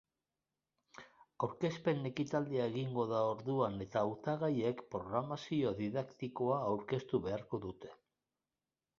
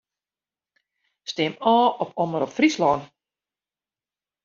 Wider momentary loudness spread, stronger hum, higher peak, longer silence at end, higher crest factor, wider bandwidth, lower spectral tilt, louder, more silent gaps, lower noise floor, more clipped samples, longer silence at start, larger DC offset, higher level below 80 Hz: about the same, 8 LU vs 9 LU; second, none vs 50 Hz at -60 dBFS; second, -20 dBFS vs -4 dBFS; second, 1.05 s vs 1.4 s; about the same, 18 dB vs 20 dB; about the same, 7.4 kHz vs 7.4 kHz; first, -6.5 dB/octave vs -3.5 dB/octave; second, -38 LUFS vs -22 LUFS; neither; about the same, under -90 dBFS vs under -90 dBFS; neither; second, 0.95 s vs 1.25 s; neither; about the same, -70 dBFS vs -66 dBFS